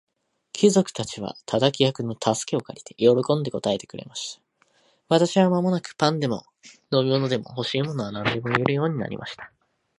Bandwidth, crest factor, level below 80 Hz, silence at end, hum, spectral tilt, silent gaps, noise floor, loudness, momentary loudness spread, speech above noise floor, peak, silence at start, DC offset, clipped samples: 11.5 kHz; 22 dB; -62 dBFS; 0.5 s; none; -5.5 dB/octave; none; -63 dBFS; -24 LUFS; 14 LU; 40 dB; -2 dBFS; 0.55 s; under 0.1%; under 0.1%